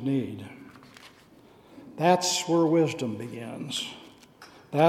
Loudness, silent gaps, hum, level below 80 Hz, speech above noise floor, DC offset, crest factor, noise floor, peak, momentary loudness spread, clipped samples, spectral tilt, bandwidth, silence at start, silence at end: -27 LUFS; none; none; -72 dBFS; 28 dB; under 0.1%; 22 dB; -55 dBFS; -6 dBFS; 24 LU; under 0.1%; -4.5 dB/octave; 16 kHz; 0 s; 0 s